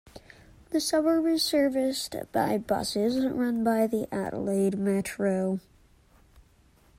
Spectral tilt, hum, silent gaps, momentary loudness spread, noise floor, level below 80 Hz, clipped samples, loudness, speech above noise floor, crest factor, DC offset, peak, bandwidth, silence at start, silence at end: -5 dB/octave; none; none; 7 LU; -60 dBFS; -58 dBFS; under 0.1%; -27 LUFS; 34 dB; 16 dB; under 0.1%; -12 dBFS; 16 kHz; 0.15 s; 0.6 s